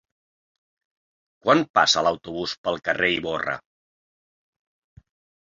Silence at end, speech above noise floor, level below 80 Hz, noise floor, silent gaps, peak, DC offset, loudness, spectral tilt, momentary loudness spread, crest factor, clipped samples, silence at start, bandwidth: 1.85 s; over 68 dB; -60 dBFS; under -90 dBFS; 1.70-1.74 s, 2.58-2.64 s; -4 dBFS; under 0.1%; -22 LUFS; -3 dB/octave; 11 LU; 22 dB; under 0.1%; 1.45 s; 7.8 kHz